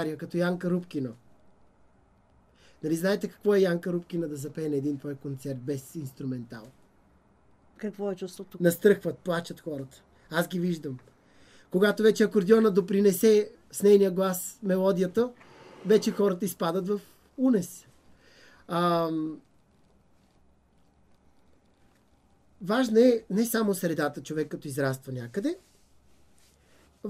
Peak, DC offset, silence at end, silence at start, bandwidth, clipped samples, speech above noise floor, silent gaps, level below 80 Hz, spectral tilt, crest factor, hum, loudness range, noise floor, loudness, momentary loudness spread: -8 dBFS; under 0.1%; 0 s; 0 s; 15.5 kHz; under 0.1%; 38 dB; none; -68 dBFS; -6 dB/octave; 20 dB; none; 11 LU; -64 dBFS; -27 LUFS; 16 LU